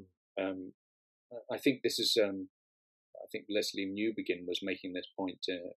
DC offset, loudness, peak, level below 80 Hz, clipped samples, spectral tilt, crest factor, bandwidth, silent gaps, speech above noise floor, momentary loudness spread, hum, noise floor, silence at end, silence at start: under 0.1%; -35 LUFS; -14 dBFS; under -90 dBFS; under 0.1%; -3.5 dB/octave; 22 dB; 14.5 kHz; 0.17-0.35 s, 0.74-1.30 s, 2.49-3.13 s; over 55 dB; 17 LU; none; under -90 dBFS; 0.05 s; 0 s